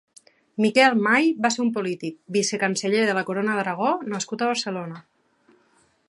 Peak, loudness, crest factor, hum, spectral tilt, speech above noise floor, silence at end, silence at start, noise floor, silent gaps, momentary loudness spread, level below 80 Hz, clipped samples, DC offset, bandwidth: -4 dBFS; -22 LUFS; 20 dB; none; -4 dB/octave; 40 dB; 1.05 s; 0.6 s; -63 dBFS; none; 13 LU; -76 dBFS; under 0.1%; under 0.1%; 11.5 kHz